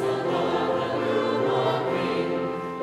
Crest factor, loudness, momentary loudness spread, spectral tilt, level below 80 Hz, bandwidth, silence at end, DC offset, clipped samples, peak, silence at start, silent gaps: 12 dB; -25 LUFS; 3 LU; -6.5 dB/octave; -64 dBFS; 13.5 kHz; 0 s; under 0.1%; under 0.1%; -12 dBFS; 0 s; none